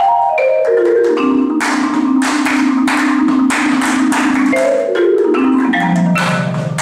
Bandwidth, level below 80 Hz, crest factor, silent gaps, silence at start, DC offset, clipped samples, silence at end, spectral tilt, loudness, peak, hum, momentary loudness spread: 14.5 kHz; -54 dBFS; 10 dB; none; 0 s; under 0.1%; under 0.1%; 0 s; -5.5 dB/octave; -13 LUFS; -2 dBFS; none; 2 LU